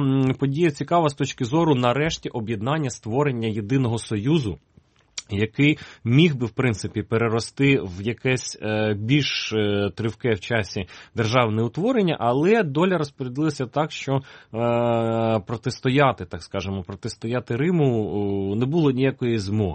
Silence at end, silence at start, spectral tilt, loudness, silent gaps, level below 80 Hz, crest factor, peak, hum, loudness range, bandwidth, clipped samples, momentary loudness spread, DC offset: 0 s; 0 s; -6 dB/octave; -23 LUFS; none; -52 dBFS; 20 dB; -2 dBFS; none; 2 LU; 8.8 kHz; under 0.1%; 9 LU; under 0.1%